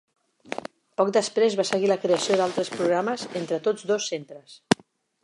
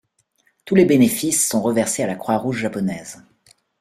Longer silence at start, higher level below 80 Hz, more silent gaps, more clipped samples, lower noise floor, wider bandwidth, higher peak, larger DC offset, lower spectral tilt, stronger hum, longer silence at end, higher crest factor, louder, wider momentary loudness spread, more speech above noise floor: second, 0.5 s vs 0.65 s; second, -70 dBFS vs -58 dBFS; neither; neither; second, -55 dBFS vs -64 dBFS; second, 11.5 kHz vs 16 kHz; about the same, -2 dBFS vs -2 dBFS; neither; about the same, -4 dB/octave vs -4.5 dB/octave; neither; second, 0.5 s vs 0.65 s; first, 24 dB vs 18 dB; second, -25 LUFS vs -18 LUFS; first, 14 LU vs 11 LU; second, 31 dB vs 46 dB